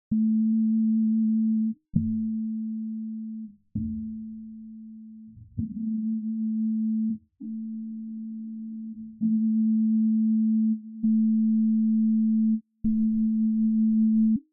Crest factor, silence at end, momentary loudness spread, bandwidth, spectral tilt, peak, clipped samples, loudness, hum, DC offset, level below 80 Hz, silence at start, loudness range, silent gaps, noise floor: 14 dB; 0.1 s; 15 LU; 0.7 kHz; -18 dB/octave; -10 dBFS; under 0.1%; -26 LUFS; none; under 0.1%; -56 dBFS; 0.1 s; 10 LU; none; -46 dBFS